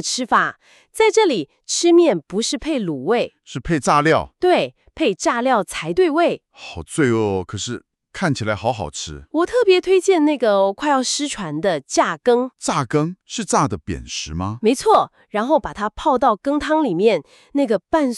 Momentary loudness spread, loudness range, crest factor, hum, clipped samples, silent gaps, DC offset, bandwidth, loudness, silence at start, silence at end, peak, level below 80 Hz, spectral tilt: 11 LU; 3 LU; 16 dB; none; under 0.1%; none; under 0.1%; 12.5 kHz; -19 LUFS; 0 s; 0 s; -4 dBFS; -46 dBFS; -4.5 dB/octave